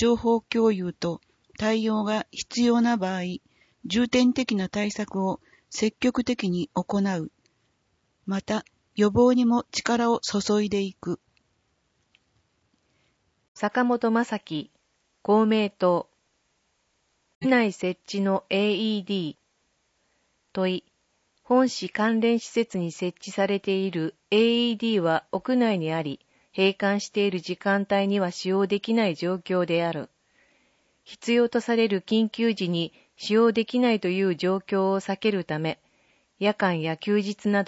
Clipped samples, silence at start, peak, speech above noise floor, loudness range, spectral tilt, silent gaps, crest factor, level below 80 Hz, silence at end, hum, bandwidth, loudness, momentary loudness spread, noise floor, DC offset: under 0.1%; 0 s; -8 dBFS; 47 dB; 4 LU; -5.5 dB/octave; 13.48-13.55 s, 17.35-17.41 s; 18 dB; -62 dBFS; 0.05 s; none; 8 kHz; -25 LUFS; 10 LU; -72 dBFS; under 0.1%